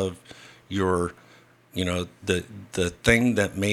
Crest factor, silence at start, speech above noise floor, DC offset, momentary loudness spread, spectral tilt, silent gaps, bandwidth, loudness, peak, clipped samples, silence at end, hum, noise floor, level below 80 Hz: 22 dB; 0 s; 29 dB; under 0.1%; 14 LU; -5 dB/octave; none; 15.5 kHz; -25 LUFS; -4 dBFS; under 0.1%; 0 s; none; -54 dBFS; -48 dBFS